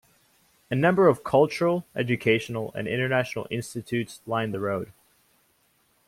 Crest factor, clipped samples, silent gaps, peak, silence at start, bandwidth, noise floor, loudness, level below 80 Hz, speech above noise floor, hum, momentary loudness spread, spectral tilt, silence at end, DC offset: 20 dB; under 0.1%; none; -8 dBFS; 0.7 s; 16.5 kHz; -66 dBFS; -25 LUFS; -64 dBFS; 42 dB; none; 12 LU; -6.5 dB/octave; 1.15 s; under 0.1%